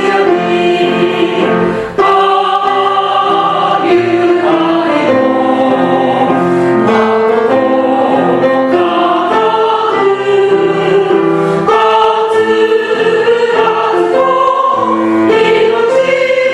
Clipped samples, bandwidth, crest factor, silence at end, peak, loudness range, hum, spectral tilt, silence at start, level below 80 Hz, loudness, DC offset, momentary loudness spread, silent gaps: under 0.1%; 11 kHz; 10 dB; 0 s; 0 dBFS; 1 LU; none; -6 dB/octave; 0 s; -50 dBFS; -10 LUFS; under 0.1%; 2 LU; none